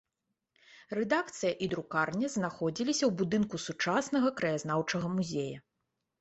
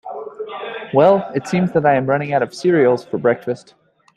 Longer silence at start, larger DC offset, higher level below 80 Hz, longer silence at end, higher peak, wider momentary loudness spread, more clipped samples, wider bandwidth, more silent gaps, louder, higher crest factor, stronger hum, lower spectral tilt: first, 0.75 s vs 0.05 s; neither; second, -68 dBFS vs -60 dBFS; about the same, 0.6 s vs 0.6 s; second, -14 dBFS vs 0 dBFS; second, 6 LU vs 15 LU; neither; second, 8.2 kHz vs 11.5 kHz; neither; second, -32 LUFS vs -17 LUFS; about the same, 18 dB vs 16 dB; neither; second, -5 dB/octave vs -7 dB/octave